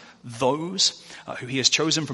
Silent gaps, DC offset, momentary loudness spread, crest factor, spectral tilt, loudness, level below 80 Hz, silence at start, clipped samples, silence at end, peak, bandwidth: none; under 0.1%; 18 LU; 22 dB; -2.5 dB/octave; -22 LUFS; -66 dBFS; 0 s; under 0.1%; 0 s; -4 dBFS; 11.5 kHz